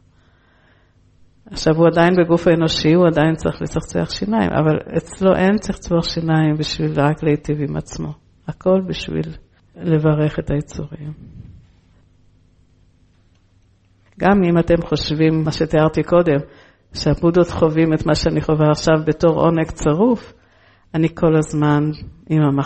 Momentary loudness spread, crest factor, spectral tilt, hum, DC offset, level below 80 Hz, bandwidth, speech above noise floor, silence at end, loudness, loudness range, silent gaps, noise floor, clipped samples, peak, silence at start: 12 LU; 16 dB; -7 dB/octave; none; under 0.1%; -38 dBFS; 8.8 kHz; 39 dB; 0 s; -17 LUFS; 7 LU; none; -55 dBFS; under 0.1%; -2 dBFS; 1.5 s